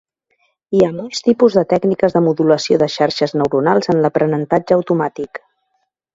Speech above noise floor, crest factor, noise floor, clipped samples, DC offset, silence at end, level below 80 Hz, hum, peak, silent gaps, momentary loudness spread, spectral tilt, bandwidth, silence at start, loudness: 54 dB; 16 dB; -69 dBFS; under 0.1%; under 0.1%; 0.8 s; -54 dBFS; none; 0 dBFS; none; 6 LU; -6 dB/octave; 7.8 kHz; 0.7 s; -15 LUFS